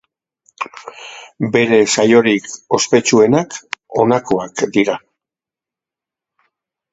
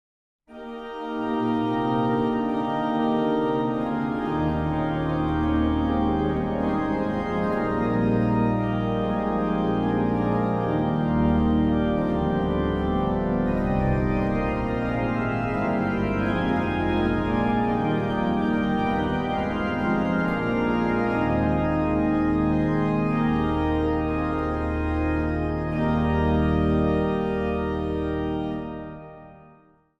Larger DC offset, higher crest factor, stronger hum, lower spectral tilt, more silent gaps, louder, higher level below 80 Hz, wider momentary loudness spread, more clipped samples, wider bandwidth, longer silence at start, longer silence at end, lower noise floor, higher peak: neither; about the same, 16 dB vs 14 dB; neither; second, -4 dB/octave vs -9 dB/octave; neither; first, -14 LUFS vs -24 LUFS; second, -56 dBFS vs -36 dBFS; first, 17 LU vs 4 LU; neither; first, 8.2 kHz vs 7.2 kHz; about the same, 0.6 s vs 0.5 s; first, 1.95 s vs 0.6 s; first, -88 dBFS vs -56 dBFS; first, 0 dBFS vs -10 dBFS